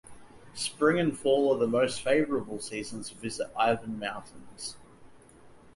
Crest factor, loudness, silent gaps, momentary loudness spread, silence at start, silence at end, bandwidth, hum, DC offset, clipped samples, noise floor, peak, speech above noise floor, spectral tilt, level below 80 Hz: 20 dB; -29 LUFS; none; 15 LU; 0.05 s; 0.2 s; 11.5 kHz; none; under 0.1%; under 0.1%; -54 dBFS; -10 dBFS; 25 dB; -4.5 dB/octave; -62 dBFS